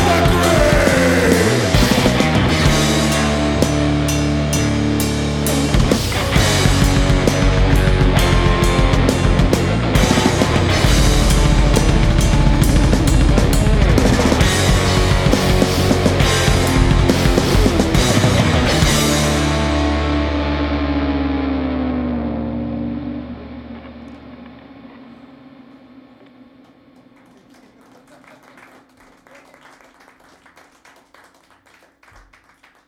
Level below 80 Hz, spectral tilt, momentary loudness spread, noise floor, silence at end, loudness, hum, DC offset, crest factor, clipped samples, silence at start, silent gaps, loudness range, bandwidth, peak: -22 dBFS; -5 dB/octave; 7 LU; -52 dBFS; 7.85 s; -15 LUFS; none; under 0.1%; 16 dB; under 0.1%; 0 s; none; 8 LU; 18 kHz; 0 dBFS